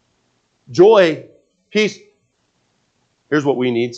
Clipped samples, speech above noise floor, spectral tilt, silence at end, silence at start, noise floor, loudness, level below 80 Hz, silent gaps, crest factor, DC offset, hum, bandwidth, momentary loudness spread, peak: under 0.1%; 51 dB; -5.5 dB/octave; 0 s; 0.7 s; -65 dBFS; -15 LUFS; -68 dBFS; none; 18 dB; under 0.1%; none; 8 kHz; 13 LU; 0 dBFS